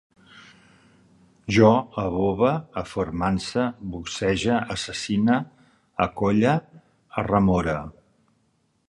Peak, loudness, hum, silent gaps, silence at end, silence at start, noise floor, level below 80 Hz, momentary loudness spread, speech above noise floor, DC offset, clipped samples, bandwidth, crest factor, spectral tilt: -4 dBFS; -23 LUFS; none; none; 0.95 s; 0.35 s; -68 dBFS; -46 dBFS; 13 LU; 45 dB; under 0.1%; under 0.1%; 11.5 kHz; 20 dB; -6 dB/octave